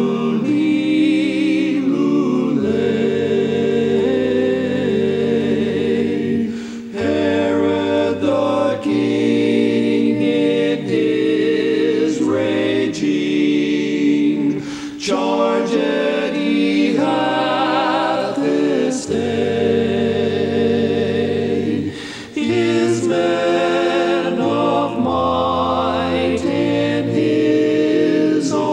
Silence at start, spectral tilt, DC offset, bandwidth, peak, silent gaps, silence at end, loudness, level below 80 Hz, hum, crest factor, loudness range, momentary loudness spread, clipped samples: 0 s; -6 dB/octave; under 0.1%; 10 kHz; -4 dBFS; none; 0 s; -17 LUFS; -54 dBFS; none; 12 dB; 2 LU; 3 LU; under 0.1%